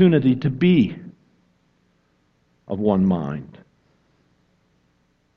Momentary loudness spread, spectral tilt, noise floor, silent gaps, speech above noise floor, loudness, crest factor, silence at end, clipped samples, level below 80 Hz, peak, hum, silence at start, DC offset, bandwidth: 17 LU; -10 dB/octave; -64 dBFS; none; 46 dB; -20 LUFS; 18 dB; 1.9 s; under 0.1%; -56 dBFS; -4 dBFS; 60 Hz at -45 dBFS; 0 s; under 0.1%; 5.4 kHz